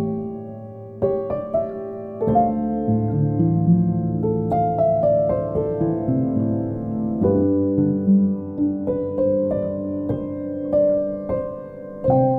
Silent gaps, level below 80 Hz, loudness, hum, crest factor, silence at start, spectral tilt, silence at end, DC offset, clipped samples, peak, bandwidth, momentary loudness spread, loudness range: none; -46 dBFS; -21 LUFS; none; 14 dB; 0 s; -13.5 dB/octave; 0 s; under 0.1%; under 0.1%; -6 dBFS; 3.4 kHz; 10 LU; 3 LU